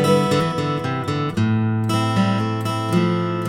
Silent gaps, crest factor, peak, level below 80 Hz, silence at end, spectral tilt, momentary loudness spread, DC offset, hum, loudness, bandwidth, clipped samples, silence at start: none; 16 dB; -4 dBFS; -52 dBFS; 0 s; -6.5 dB/octave; 5 LU; under 0.1%; none; -20 LUFS; 15.5 kHz; under 0.1%; 0 s